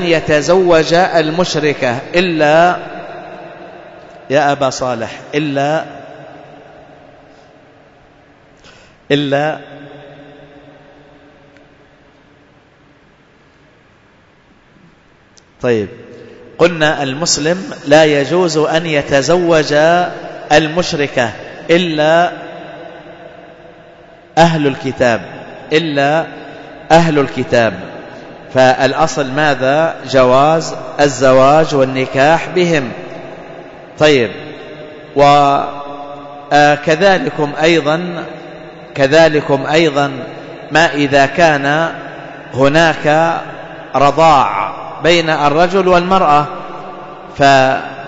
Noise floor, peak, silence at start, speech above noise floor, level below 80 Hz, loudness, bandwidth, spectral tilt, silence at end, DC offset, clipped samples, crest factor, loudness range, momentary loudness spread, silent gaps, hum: -48 dBFS; 0 dBFS; 0 s; 36 dB; -42 dBFS; -12 LUFS; 8 kHz; -5 dB/octave; 0 s; under 0.1%; under 0.1%; 14 dB; 10 LU; 20 LU; none; none